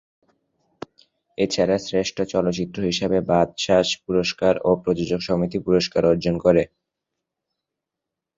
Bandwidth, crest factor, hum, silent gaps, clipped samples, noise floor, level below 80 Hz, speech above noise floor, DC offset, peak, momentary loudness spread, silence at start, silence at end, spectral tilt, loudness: 7.8 kHz; 20 dB; none; none; under 0.1%; -85 dBFS; -50 dBFS; 64 dB; under 0.1%; -2 dBFS; 7 LU; 1.4 s; 1.7 s; -5.5 dB/octave; -21 LUFS